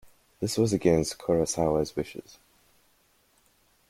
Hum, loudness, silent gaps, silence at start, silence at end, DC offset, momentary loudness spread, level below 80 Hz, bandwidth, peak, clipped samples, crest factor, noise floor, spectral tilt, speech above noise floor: none; -27 LUFS; none; 0.4 s; 1.7 s; under 0.1%; 11 LU; -52 dBFS; 16.5 kHz; -8 dBFS; under 0.1%; 20 dB; -66 dBFS; -5.5 dB/octave; 40 dB